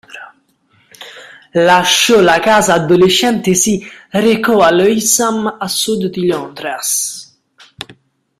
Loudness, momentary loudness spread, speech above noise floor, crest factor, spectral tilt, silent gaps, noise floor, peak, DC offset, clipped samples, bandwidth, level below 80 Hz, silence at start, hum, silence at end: -12 LUFS; 22 LU; 43 dB; 14 dB; -3 dB/octave; none; -55 dBFS; 0 dBFS; under 0.1%; under 0.1%; 16 kHz; -50 dBFS; 0.1 s; none; 0.45 s